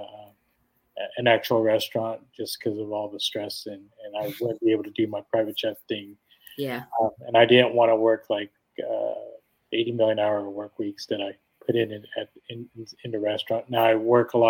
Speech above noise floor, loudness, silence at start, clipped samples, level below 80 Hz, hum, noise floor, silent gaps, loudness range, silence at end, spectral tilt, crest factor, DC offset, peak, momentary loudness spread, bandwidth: 45 dB; -25 LUFS; 0 s; under 0.1%; -74 dBFS; none; -70 dBFS; none; 6 LU; 0 s; -5.5 dB/octave; 22 dB; under 0.1%; -2 dBFS; 18 LU; 17.5 kHz